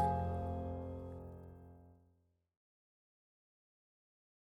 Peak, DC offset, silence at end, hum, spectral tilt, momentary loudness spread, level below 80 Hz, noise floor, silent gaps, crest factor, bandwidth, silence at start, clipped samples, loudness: -22 dBFS; under 0.1%; 2.6 s; none; -9.5 dB/octave; 21 LU; -58 dBFS; -76 dBFS; none; 22 dB; 11 kHz; 0 s; under 0.1%; -43 LUFS